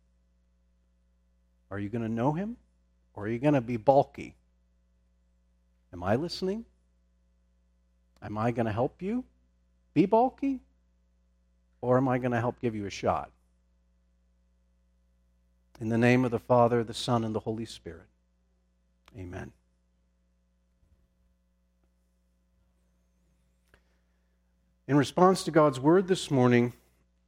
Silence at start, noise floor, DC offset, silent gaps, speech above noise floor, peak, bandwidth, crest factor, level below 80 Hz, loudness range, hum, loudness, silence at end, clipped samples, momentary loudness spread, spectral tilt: 1.7 s; -71 dBFS; under 0.1%; none; 44 dB; -8 dBFS; 15.5 kHz; 24 dB; -62 dBFS; 11 LU; 60 Hz at -55 dBFS; -27 LUFS; 0.55 s; under 0.1%; 18 LU; -6.5 dB/octave